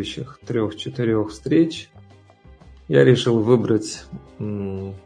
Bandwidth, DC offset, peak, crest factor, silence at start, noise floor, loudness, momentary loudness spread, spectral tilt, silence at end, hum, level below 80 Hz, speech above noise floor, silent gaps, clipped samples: 10.5 kHz; under 0.1%; -2 dBFS; 20 dB; 0 s; -48 dBFS; -20 LUFS; 17 LU; -6.5 dB/octave; 0.05 s; none; -52 dBFS; 28 dB; none; under 0.1%